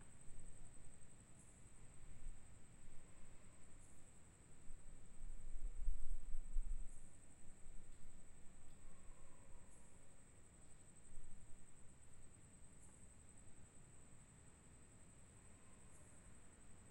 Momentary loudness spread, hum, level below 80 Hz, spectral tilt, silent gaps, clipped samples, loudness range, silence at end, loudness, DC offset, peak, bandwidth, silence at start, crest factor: 11 LU; none; -52 dBFS; -4.5 dB/octave; none; under 0.1%; 9 LU; 0 s; -62 LUFS; under 0.1%; -26 dBFS; 9 kHz; 0 s; 20 dB